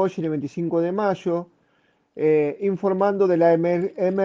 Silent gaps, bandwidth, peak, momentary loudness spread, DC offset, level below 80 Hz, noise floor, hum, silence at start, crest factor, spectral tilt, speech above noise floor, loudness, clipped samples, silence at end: none; 7.4 kHz; -6 dBFS; 9 LU; under 0.1%; -68 dBFS; -64 dBFS; none; 0 s; 16 dB; -8.5 dB/octave; 44 dB; -22 LUFS; under 0.1%; 0 s